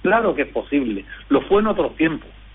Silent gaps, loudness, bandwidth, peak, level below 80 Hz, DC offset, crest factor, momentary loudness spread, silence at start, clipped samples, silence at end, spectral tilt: none; -20 LUFS; 4 kHz; -4 dBFS; -42 dBFS; under 0.1%; 16 dB; 9 LU; 0 s; under 0.1%; 0.05 s; -4.5 dB/octave